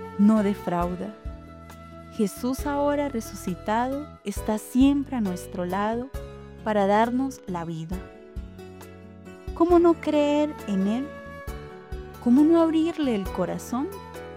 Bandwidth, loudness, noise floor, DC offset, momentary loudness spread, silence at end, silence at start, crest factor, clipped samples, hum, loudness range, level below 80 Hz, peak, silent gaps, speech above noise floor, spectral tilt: 16.5 kHz; -25 LUFS; -44 dBFS; under 0.1%; 21 LU; 0 s; 0 s; 18 dB; under 0.1%; none; 5 LU; -44 dBFS; -8 dBFS; none; 20 dB; -6.5 dB/octave